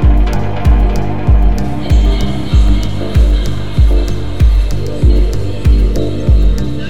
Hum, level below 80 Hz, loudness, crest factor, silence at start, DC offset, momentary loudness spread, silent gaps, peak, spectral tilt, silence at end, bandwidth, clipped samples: 50 Hz at -20 dBFS; -12 dBFS; -14 LUFS; 10 dB; 0 s; 10%; 4 LU; none; 0 dBFS; -7.5 dB/octave; 0 s; 8 kHz; under 0.1%